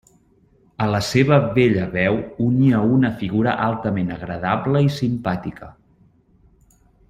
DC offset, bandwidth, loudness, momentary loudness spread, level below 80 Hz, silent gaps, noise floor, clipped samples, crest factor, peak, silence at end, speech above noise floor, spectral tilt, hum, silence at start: under 0.1%; 14.5 kHz; -19 LUFS; 9 LU; -48 dBFS; none; -57 dBFS; under 0.1%; 18 dB; -2 dBFS; 1.4 s; 38 dB; -7 dB/octave; none; 0.8 s